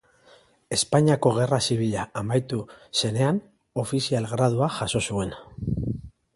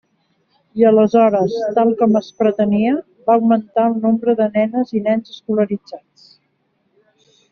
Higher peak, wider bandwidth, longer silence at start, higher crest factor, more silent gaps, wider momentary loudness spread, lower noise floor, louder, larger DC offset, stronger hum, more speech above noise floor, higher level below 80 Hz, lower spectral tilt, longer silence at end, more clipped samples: second, -6 dBFS vs -2 dBFS; first, 11.5 kHz vs 6.4 kHz; about the same, 0.7 s vs 0.75 s; about the same, 20 dB vs 16 dB; neither; first, 12 LU vs 9 LU; second, -56 dBFS vs -65 dBFS; second, -25 LUFS vs -16 LUFS; neither; neither; second, 32 dB vs 50 dB; first, -48 dBFS vs -62 dBFS; second, -5 dB/octave vs -6.5 dB/octave; second, 0.25 s vs 1.55 s; neither